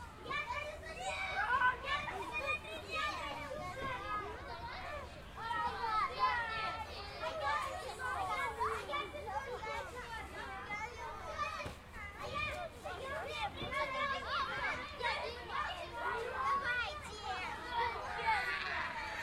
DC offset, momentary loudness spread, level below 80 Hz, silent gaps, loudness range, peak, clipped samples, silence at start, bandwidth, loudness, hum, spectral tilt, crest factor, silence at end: under 0.1%; 10 LU; -56 dBFS; none; 5 LU; -22 dBFS; under 0.1%; 0 s; 16 kHz; -39 LUFS; none; -3.5 dB/octave; 18 dB; 0 s